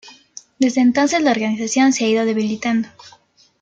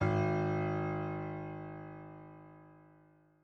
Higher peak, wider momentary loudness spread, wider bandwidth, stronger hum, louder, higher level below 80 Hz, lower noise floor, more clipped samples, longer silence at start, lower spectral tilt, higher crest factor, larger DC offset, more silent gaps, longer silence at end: first, -4 dBFS vs -20 dBFS; second, 7 LU vs 22 LU; first, 9 kHz vs 6.6 kHz; second, none vs 50 Hz at -85 dBFS; first, -17 LUFS vs -36 LUFS; about the same, -64 dBFS vs -64 dBFS; second, -43 dBFS vs -65 dBFS; neither; about the same, 0.05 s vs 0 s; second, -4 dB/octave vs -9 dB/octave; about the same, 14 dB vs 18 dB; neither; neither; second, 0.5 s vs 0.65 s